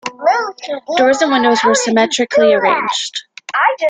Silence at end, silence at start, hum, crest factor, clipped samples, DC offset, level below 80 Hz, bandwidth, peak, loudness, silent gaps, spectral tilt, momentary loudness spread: 0 s; 0.05 s; none; 14 dB; under 0.1%; under 0.1%; -60 dBFS; 9.6 kHz; 0 dBFS; -14 LUFS; none; -2.5 dB/octave; 10 LU